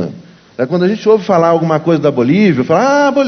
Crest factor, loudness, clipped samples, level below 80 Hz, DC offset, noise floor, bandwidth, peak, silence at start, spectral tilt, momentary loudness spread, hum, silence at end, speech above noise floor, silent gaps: 12 dB; -12 LUFS; under 0.1%; -52 dBFS; under 0.1%; -33 dBFS; 6.6 kHz; 0 dBFS; 0 s; -7 dB/octave; 8 LU; none; 0 s; 22 dB; none